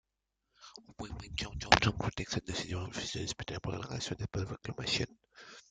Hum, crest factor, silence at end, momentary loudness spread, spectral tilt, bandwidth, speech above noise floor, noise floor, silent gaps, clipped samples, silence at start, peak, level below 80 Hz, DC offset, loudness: none; 34 dB; 0.1 s; 25 LU; -4 dB/octave; 9.4 kHz; 50 dB; -86 dBFS; none; under 0.1%; 0.6 s; -4 dBFS; -52 dBFS; under 0.1%; -35 LUFS